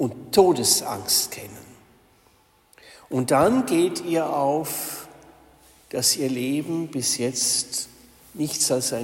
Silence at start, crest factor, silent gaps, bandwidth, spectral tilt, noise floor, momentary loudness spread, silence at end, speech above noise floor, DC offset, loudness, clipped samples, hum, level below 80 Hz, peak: 0 s; 20 dB; none; 16.5 kHz; -3 dB/octave; -59 dBFS; 12 LU; 0 s; 37 dB; under 0.1%; -22 LUFS; under 0.1%; none; -60 dBFS; -4 dBFS